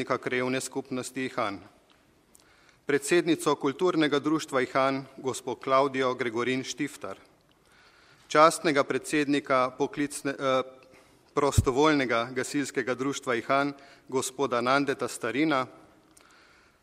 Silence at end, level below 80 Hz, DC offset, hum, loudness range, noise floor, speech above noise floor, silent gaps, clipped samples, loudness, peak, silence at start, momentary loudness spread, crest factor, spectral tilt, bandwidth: 1.1 s; -52 dBFS; under 0.1%; none; 4 LU; -62 dBFS; 35 dB; none; under 0.1%; -27 LUFS; -4 dBFS; 0 s; 10 LU; 24 dB; -4.5 dB/octave; 15.5 kHz